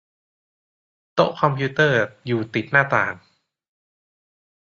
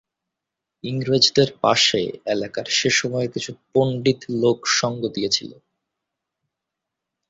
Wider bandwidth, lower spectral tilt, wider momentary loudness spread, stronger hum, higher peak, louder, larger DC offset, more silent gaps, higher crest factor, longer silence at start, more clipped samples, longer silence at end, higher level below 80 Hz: second, 7.2 kHz vs 8 kHz; first, -6.5 dB/octave vs -3.5 dB/octave; second, 8 LU vs 11 LU; neither; about the same, -2 dBFS vs 0 dBFS; about the same, -20 LUFS vs -20 LUFS; neither; neither; about the same, 22 dB vs 22 dB; first, 1.15 s vs 0.85 s; neither; second, 1.6 s vs 1.75 s; about the same, -62 dBFS vs -58 dBFS